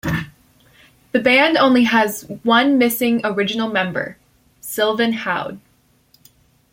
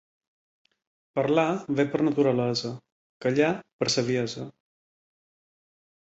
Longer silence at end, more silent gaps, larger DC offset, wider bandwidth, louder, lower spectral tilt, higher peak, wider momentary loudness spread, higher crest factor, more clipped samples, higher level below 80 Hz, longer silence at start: second, 1.15 s vs 1.55 s; second, none vs 2.92-3.20 s, 3.73-3.79 s; neither; first, 16.5 kHz vs 8.2 kHz; first, -17 LUFS vs -26 LUFS; about the same, -4.5 dB/octave vs -5 dB/octave; first, -2 dBFS vs -8 dBFS; about the same, 14 LU vs 12 LU; about the same, 16 dB vs 20 dB; neither; first, -52 dBFS vs -68 dBFS; second, 0.05 s vs 1.15 s